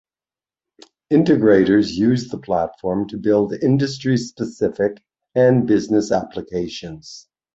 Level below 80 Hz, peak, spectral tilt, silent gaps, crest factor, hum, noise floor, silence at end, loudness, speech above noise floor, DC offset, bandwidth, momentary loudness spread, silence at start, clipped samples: -52 dBFS; -2 dBFS; -7 dB/octave; none; 16 dB; none; under -90 dBFS; 0.35 s; -19 LUFS; over 72 dB; under 0.1%; 8 kHz; 13 LU; 1.1 s; under 0.1%